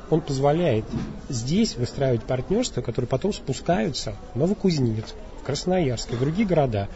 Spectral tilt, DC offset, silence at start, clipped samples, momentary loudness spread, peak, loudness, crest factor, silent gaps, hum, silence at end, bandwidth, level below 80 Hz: -6 dB/octave; 0.4%; 0 s; under 0.1%; 9 LU; -8 dBFS; -25 LUFS; 16 dB; none; none; 0 s; 8 kHz; -40 dBFS